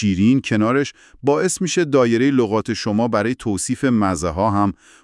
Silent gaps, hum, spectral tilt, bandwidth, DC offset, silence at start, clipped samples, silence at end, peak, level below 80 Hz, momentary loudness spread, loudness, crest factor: none; none; -5.5 dB/octave; 12 kHz; under 0.1%; 0 s; under 0.1%; 0.3 s; -2 dBFS; -50 dBFS; 6 LU; -19 LUFS; 16 dB